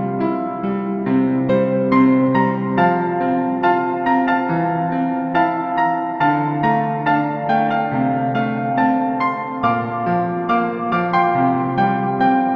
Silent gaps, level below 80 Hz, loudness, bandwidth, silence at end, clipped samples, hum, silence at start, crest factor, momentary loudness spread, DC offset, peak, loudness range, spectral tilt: none; -54 dBFS; -18 LUFS; 5.6 kHz; 0 s; under 0.1%; none; 0 s; 14 dB; 4 LU; under 0.1%; -4 dBFS; 2 LU; -9.5 dB/octave